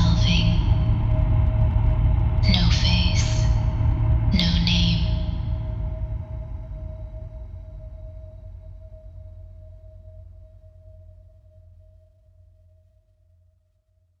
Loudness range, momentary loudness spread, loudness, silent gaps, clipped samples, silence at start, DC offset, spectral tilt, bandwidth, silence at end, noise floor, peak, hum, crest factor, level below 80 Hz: 22 LU; 23 LU; -22 LUFS; none; under 0.1%; 0 s; under 0.1%; -6 dB/octave; 7.6 kHz; 3.75 s; -65 dBFS; -4 dBFS; none; 18 dB; -26 dBFS